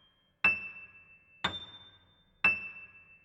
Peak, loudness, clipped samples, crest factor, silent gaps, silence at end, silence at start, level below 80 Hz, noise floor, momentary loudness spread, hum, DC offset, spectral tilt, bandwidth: -12 dBFS; -30 LUFS; under 0.1%; 24 dB; none; 0.25 s; 0.45 s; -66 dBFS; -65 dBFS; 23 LU; none; under 0.1%; -3.5 dB/octave; 9.2 kHz